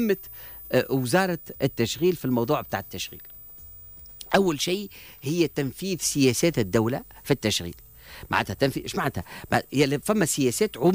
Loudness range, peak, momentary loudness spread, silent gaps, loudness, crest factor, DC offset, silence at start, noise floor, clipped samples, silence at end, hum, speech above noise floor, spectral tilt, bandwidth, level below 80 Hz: 3 LU; -10 dBFS; 18 LU; none; -25 LUFS; 16 dB; under 0.1%; 0 s; -45 dBFS; under 0.1%; 0 s; none; 20 dB; -4.5 dB/octave; 16 kHz; -52 dBFS